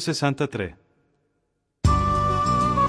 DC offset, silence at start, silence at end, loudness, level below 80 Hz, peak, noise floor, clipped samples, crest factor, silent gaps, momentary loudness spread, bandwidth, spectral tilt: under 0.1%; 0 s; 0 s; -23 LUFS; -34 dBFS; -6 dBFS; -74 dBFS; under 0.1%; 16 dB; none; 9 LU; 11 kHz; -6 dB/octave